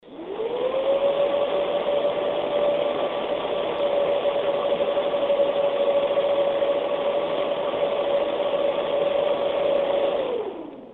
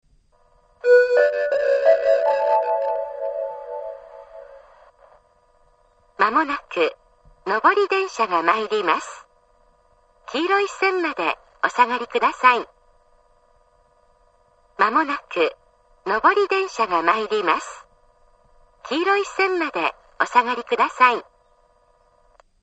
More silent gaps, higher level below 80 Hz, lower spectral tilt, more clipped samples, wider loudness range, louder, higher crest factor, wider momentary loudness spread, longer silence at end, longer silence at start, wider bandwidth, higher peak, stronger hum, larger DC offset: neither; about the same, -60 dBFS vs -62 dBFS; first, -6.5 dB/octave vs -3 dB/octave; neither; second, 1 LU vs 6 LU; second, -23 LUFS vs -20 LUFS; second, 12 dB vs 22 dB; second, 4 LU vs 13 LU; second, 0 s vs 1.4 s; second, 0.05 s vs 0.85 s; second, 4.2 kHz vs 8.6 kHz; second, -10 dBFS vs -2 dBFS; neither; neither